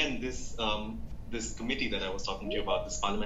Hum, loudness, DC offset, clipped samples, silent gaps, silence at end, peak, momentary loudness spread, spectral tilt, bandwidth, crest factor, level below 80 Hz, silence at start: none; -34 LUFS; under 0.1%; under 0.1%; none; 0 s; -16 dBFS; 7 LU; -3.5 dB/octave; 8.2 kHz; 18 dB; -42 dBFS; 0 s